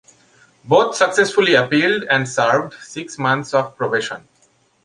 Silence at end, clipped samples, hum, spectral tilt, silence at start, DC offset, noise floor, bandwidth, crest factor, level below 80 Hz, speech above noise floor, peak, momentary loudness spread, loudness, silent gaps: 0.65 s; under 0.1%; none; -4 dB/octave; 0.65 s; under 0.1%; -58 dBFS; 11.5 kHz; 18 dB; -62 dBFS; 41 dB; 0 dBFS; 15 LU; -17 LUFS; none